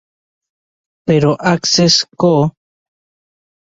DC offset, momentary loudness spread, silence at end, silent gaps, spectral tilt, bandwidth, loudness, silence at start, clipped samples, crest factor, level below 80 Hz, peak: under 0.1%; 7 LU; 1.15 s; none; -4.5 dB/octave; 7.8 kHz; -13 LUFS; 1.05 s; under 0.1%; 16 dB; -50 dBFS; 0 dBFS